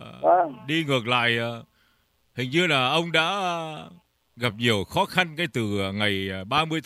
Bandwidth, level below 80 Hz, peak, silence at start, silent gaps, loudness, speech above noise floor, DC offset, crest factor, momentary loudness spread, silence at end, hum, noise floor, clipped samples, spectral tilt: 15.5 kHz; -62 dBFS; -4 dBFS; 0 s; none; -24 LUFS; 42 dB; under 0.1%; 22 dB; 11 LU; 0.05 s; none; -66 dBFS; under 0.1%; -5 dB/octave